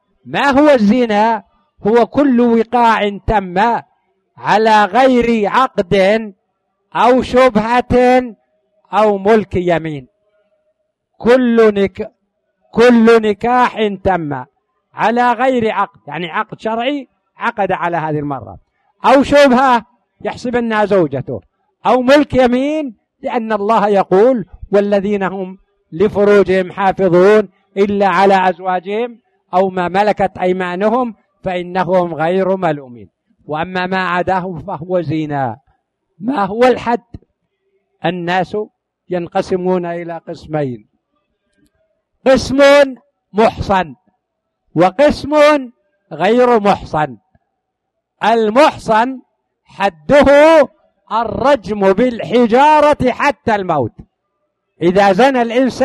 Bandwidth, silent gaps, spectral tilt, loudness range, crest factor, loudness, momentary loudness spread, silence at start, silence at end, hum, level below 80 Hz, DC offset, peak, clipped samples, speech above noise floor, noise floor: 12.5 kHz; none; -6 dB/octave; 6 LU; 14 dB; -13 LUFS; 13 LU; 0.25 s; 0 s; none; -42 dBFS; under 0.1%; 0 dBFS; under 0.1%; 61 dB; -73 dBFS